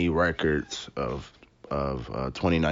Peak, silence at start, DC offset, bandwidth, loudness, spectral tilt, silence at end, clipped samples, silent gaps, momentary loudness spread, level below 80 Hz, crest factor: -10 dBFS; 0 s; under 0.1%; 7.6 kHz; -29 LUFS; -5 dB/octave; 0 s; under 0.1%; none; 10 LU; -42 dBFS; 16 dB